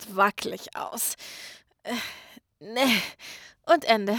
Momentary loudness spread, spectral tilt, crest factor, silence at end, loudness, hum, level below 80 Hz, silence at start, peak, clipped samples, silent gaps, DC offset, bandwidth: 20 LU; -2.5 dB/octave; 20 dB; 0 s; -26 LUFS; none; -70 dBFS; 0 s; -6 dBFS; under 0.1%; none; under 0.1%; over 20 kHz